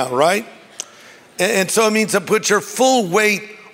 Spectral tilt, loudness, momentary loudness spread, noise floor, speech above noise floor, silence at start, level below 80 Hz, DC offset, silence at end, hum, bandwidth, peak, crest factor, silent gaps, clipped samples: -3 dB/octave; -16 LUFS; 17 LU; -44 dBFS; 27 dB; 0 s; -68 dBFS; under 0.1%; 0.15 s; none; 16.5 kHz; -2 dBFS; 16 dB; none; under 0.1%